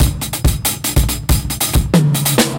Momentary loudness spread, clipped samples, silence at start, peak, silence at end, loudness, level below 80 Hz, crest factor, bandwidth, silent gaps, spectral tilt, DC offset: 4 LU; under 0.1%; 0 s; -2 dBFS; 0 s; -15 LUFS; -20 dBFS; 12 dB; 17.5 kHz; none; -4.5 dB/octave; under 0.1%